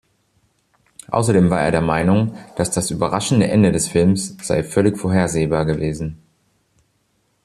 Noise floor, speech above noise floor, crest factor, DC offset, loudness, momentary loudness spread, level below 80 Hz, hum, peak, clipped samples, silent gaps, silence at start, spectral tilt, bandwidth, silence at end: -65 dBFS; 48 dB; 16 dB; under 0.1%; -18 LUFS; 8 LU; -44 dBFS; none; -2 dBFS; under 0.1%; none; 1.1 s; -6 dB/octave; 13.5 kHz; 1.3 s